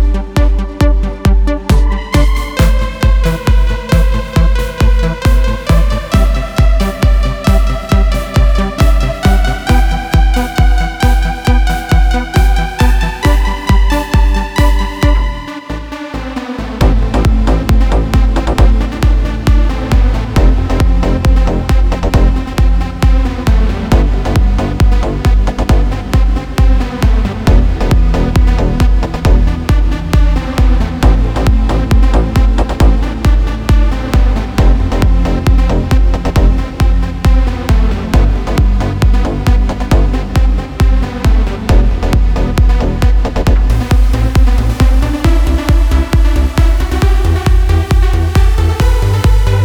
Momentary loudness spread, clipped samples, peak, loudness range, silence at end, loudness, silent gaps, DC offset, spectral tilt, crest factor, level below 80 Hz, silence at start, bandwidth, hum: 2 LU; 0.1%; 0 dBFS; 1 LU; 0 s; -13 LUFS; none; under 0.1%; -6.5 dB/octave; 10 dB; -10 dBFS; 0 s; 13.5 kHz; none